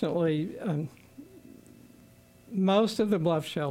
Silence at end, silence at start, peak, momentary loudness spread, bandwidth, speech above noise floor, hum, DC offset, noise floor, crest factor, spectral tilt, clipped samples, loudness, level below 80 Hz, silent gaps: 0 s; 0 s; -12 dBFS; 10 LU; 16 kHz; 29 dB; none; under 0.1%; -56 dBFS; 16 dB; -7 dB/octave; under 0.1%; -28 LUFS; -68 dBFS; none